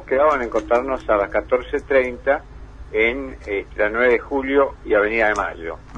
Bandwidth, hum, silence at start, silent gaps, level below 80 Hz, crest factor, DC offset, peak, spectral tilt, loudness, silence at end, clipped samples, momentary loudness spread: 9.4 kHz; 50 Hz at -40 dBFS; 0 s; none; -40 dBFS; 16 dB; under 0.1%; -4 dBFS; -5.5 dB/octave; -20 LUFS; 0 s; under 0.1%; 9 LU